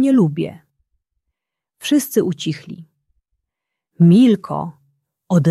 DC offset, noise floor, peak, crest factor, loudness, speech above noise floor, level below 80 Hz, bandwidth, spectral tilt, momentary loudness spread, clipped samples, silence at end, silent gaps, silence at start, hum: under 0.1%; -81 dBFS; -2 dBFS; 16 dB; -16 LUFS; 66 dB; -62 dBFS; 14 kHz; -7 dB/octave; 19 LU; under 0.1%; 0 s; none; 0 s; none